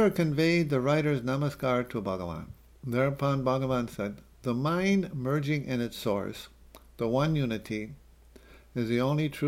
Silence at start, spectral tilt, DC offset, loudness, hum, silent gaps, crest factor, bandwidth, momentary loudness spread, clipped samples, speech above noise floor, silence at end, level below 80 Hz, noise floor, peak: 0 s; -7 dB/octave; under 0.1%; -29 LUFS; none; none; 16 dB; 16.5 kHz; 12 LU; under 0.1%; 26 dB; 0 s; -54 dBFS; -55 dBFS; -14 dBFS